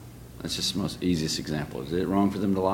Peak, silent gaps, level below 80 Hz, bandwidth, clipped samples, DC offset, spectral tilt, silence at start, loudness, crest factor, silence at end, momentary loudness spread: -10 dBFS; none; -50 dBFS; 17 kHz; under 0.1%; under 0.1%; -5 dB/octave; 0 s; -28 LUFS; 18 dB; 0 s; 8 LU